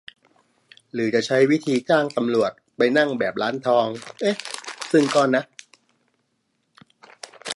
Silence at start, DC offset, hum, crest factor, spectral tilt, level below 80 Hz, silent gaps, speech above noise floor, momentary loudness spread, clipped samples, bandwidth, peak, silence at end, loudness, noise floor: 0.95 s; under 0.1%; none; 18 dB; -5 dB/octave; -72 dBFS; none; 51 dB; 14 LU; under 0.1%; 11.5 kHz; -6 dBFS; 0 s; -21 LUFS; -71 dBFS